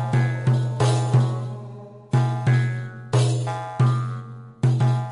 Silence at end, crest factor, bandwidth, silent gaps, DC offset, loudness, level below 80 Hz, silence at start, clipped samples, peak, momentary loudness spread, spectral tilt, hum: 0 s; 14 dB; 11 kHz; none; under 0.1%; -22 LUFS; -54 dBFS; 0 s; under 0.1%; -8 dBFS; 13 LU; -7 dB/octave; none